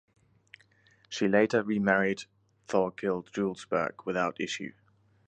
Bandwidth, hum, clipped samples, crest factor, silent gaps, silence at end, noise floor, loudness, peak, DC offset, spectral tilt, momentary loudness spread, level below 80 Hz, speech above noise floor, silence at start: 9.2 kHz; none; under 0.1%; 22 dB; none; 0.6 s; -64 dBFS; -29 LUFS; -8 dBFS; under 0.1%; -5.5 dB/octave; 12 LU; -68 dBFS; 35 dB; 1.1 s